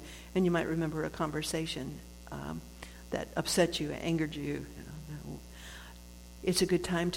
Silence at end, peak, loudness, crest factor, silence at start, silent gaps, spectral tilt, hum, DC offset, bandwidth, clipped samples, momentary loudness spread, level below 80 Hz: 0 s; -16 dBFS; -33 LUFS; 20 dB; 0 s; none; -4.5 dB/octave; 60 Hz at -50 dBFS; under 0.1%; 16.5 kHz; under 0.1%; 18 LU; -52 dBFS